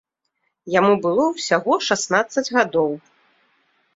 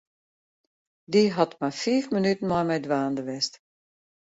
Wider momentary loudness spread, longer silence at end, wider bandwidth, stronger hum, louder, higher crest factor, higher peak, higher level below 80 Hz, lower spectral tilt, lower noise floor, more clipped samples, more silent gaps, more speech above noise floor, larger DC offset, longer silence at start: about the same, 5 LU vs 7 LU; first, 1 s vs 0.75 s; about the same, 8 kHz vs 8 kHz; neither; first, -19 LUFS vs -25 LUFS; about the same, 18 dB vs 20 dB; first, -2 dBFS vs -6 dBFS; about the same, -66 dBFS vs -64 dBFS; second, -3.5 dB/octave vs -5.5 dB/octave; second, -73 dBFS vs under -90 dBFS; neither; neither; second, 54 dB vs over 65 dB; neither; second, 0.65 s vs 1.1 s